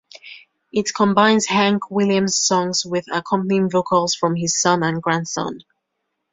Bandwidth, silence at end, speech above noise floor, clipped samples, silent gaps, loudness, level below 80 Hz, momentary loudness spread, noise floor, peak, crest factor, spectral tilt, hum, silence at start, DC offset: 7.8 kHz; 0.75 s; 57 dB; under 0.1%; none; -18 LUFS; -60 dBFS; 10 LU; -76 dBFS; -2 dBFS; 18 dB; -4 dB/octave; none; 0.25 s; under 0.1%